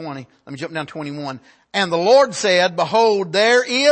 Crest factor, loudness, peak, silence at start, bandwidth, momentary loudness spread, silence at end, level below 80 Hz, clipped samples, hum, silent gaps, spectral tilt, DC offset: 14 dB; -16 LUFS; -4 dBFS; 0 s; 8.8 kHz; 18 LU; 0 s; -68 dBFS; under 0.1%; none; none; -3.5 dB/octave; under 0.1%